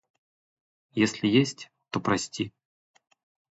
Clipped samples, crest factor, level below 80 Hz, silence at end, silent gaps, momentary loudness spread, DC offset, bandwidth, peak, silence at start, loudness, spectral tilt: under 0.1%; 22 dB; -64 dBFS; 1 s; none; 12 LU; under 0.1%; 8.2 kHz; -8 dBFS; 0.95 s; -27 LUFS; -5 dB/octave